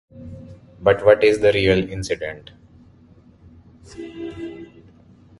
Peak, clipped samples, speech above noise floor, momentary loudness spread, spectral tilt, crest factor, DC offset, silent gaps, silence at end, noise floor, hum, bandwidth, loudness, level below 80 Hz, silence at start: 0 dBFS; under 0.1%; 31 dB; 25 LU; -5.5 dB/octave; 22 dB; under 0.1%; none; 0.75 s; -50 dBFS; none; 11.5 kHz; -18 LUFS; -46 dBFS; 0.15 s